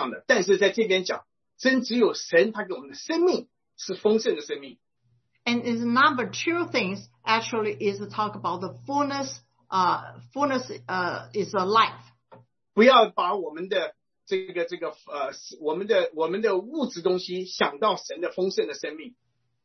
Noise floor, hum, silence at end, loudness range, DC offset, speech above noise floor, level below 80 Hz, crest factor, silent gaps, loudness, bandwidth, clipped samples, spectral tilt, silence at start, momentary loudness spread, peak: -70 dBFS; none; 0.55 s; 5 LU; under 0.1%; 45 dB; -74 dBFS; 22 dB; none; -25 LUFS; 6.4 kHz; under 0.1%; -4 dB/octave; 0 s; 12 LU; -4 dBFS